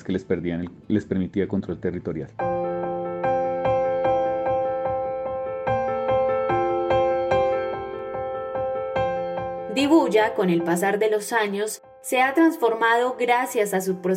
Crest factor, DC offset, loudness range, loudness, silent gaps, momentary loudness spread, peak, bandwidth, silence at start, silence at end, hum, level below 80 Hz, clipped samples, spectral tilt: 16 dB; under 0.1%; 4 LU; -23 LUFS; none; 9 LU; -6 dBFS; 16.5 kHz; 0 s; 0 s; none; -52 dBFS; under 0.1%; -5.5 dB/octave